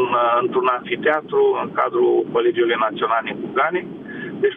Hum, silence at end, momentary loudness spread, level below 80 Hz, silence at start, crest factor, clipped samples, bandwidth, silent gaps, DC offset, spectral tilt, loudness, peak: none; 0 s; 7 LU; -66 dBFS; 0 s; 14 dB; under 0.1%; 3.8 kHz; none; under 0.1%; -8 dB/octave; -19 LUFS; -6 dBFS